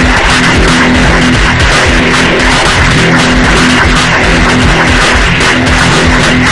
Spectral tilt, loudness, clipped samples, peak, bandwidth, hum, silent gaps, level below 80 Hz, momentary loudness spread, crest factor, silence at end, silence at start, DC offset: -4 dB/octave; -6 LUFS; 3%; 0 dBFS; 12 kHz; none; none; -14 dBFS; 1 LU; 6 dB; 0 s; 0 s; under 0.1%